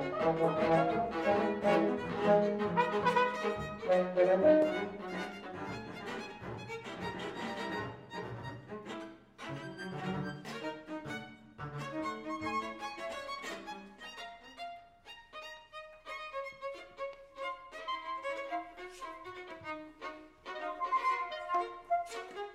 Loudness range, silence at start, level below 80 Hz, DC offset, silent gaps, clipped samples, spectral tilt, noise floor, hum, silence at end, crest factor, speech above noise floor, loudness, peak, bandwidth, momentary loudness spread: 14 LU; 0 s; -64 dBFS; under 0.1%; none; under 0.1%; -6 dB/octave; -55 dBFS; none; 0 s; 20 dB; 25 dB; -35 LUFS; -14 dBFS; 14.5 kHz; 18 LU